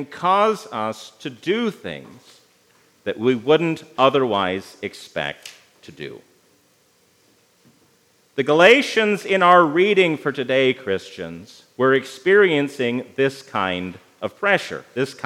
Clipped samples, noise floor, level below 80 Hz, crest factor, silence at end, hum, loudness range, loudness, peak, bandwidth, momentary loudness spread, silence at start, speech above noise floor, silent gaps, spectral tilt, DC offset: under 0.1%; -59 dBFS; -70 dBFS; 20 dB; 0.1 s; none; 12 LU; -19 LUFS; 0 dBFS; 14 kHz; 20 LU; 0 s; 40 dB; none; -5 dB/octave; under 0.1%